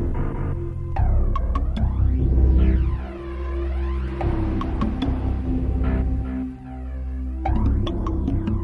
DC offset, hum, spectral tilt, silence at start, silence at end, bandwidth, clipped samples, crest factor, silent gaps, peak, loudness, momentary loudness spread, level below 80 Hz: under 0.1%; none; -9.5 dB/octave; 0 s; 0 s; 4.1 kHz; under 0.1%; 14 dB; none; -6 dBFS; -24 LUFS; 10 LU; -22 dBFS